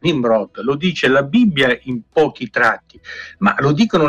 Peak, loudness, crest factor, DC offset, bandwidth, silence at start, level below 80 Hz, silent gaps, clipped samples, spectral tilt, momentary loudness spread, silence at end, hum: -4 dBFS; -16 LUFS; 12 dB; under 0.1%; 10 kHz; 0.05 s; -50 dBFS; none; under 0.1%; -6 dB/octave; 10 LU; 0 s; none